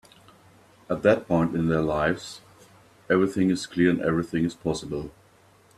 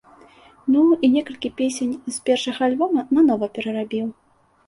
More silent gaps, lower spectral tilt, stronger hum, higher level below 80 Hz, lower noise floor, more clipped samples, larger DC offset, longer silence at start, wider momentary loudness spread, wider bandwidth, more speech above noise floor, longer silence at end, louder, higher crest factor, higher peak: neither; first, -6.5 dB/octave vs -4.5 dB/octave; neither; first, -52 dBFS vs -62 dBFS; first, -57 dBFS vs -50 dBFS; neither; neither; first, 0.9 s vs 0.65 s; about the same, 12 LU vs 10 LU; first, 13 kHz vs 11.5 kHz; about the same, 33 dB vs 30 dB; about the same, 0.65 s vs 0.55 s; second, -25 LUFS vs -21 LUFS; first, 20 dB vs 14 dB; about the same, -6 dBFS vs -6 dBFS